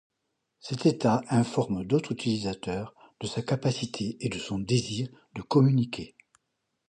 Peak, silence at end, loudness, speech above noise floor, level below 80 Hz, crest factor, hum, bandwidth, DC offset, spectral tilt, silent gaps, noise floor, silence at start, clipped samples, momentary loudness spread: -10 dBFS; 0.85 s; -28 LUFS; 53 dB; -58 dBFS; 20 dB; none; 10.5 kHz; under 0.1%; -6.5 dB/octave; none; -80 dBFS; 0.65 s; under 0.1%; 14 LU